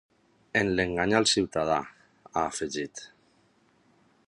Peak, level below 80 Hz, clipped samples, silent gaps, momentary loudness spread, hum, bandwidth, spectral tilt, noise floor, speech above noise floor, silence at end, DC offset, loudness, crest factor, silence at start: -6 dBFS; -56 dBFS; under 0.1%; none; 13 LU; none; 11.5 kHz; -3.5 dB/octave; -65 dBFS; 38 dB; 1.2 s; under 0.1%; -27 LUFS; 24 dB; 0.55 s